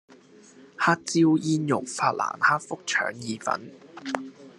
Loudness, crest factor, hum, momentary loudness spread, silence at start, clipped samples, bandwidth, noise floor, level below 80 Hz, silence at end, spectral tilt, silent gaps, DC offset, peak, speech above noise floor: -25 LUFS; 22 dB; none; 12 LU; 0.8 s; under 0.1%; 11 kHz; -52 dBFS; -76 dBFS; 0.1 s; -4.5 dB/octave; none; under 0.1%; -4 dBFS; 27 dB